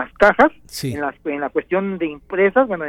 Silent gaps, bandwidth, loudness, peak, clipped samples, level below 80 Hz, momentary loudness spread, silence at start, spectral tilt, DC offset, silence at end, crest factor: none; 17 kHz; -19 LUFS; -2 dBFS; under 0.1%; -46 dBFS; 12 LU; 0 s; -5.5 dB/octave; under 0.1%; 0 s; 18 dB